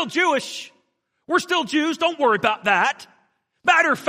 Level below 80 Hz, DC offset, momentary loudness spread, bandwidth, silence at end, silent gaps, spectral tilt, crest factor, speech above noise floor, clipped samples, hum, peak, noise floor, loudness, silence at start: -74 dBFS; under 0.1%; 14 LU; 15.5 kHz; 0 s; none; -3 dB/octave; 20 dB; 50 dB; under 0.1%; none; -2 dBFS; -71 dBFS; -20 LUFS; 0 s